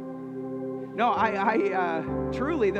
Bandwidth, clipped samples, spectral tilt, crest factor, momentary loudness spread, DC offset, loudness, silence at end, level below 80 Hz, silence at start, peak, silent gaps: 8.4 kHz; under 0.1%; -7 dB/octave; 18 dB; 11 LU; under 0.1%; -27 LUFS; 0 s; -50 dBFS; 0 s; -10 dBFS; none